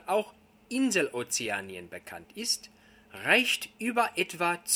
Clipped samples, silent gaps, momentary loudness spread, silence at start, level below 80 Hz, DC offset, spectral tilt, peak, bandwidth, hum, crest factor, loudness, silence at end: under 0.1%; none; 19 LU; 0.05 s; -72 dBFS; under 0.1%; -2 dB/octave; -8 dBFS; 19 kHz; none; 24 dB; -28 LUFS; 0 s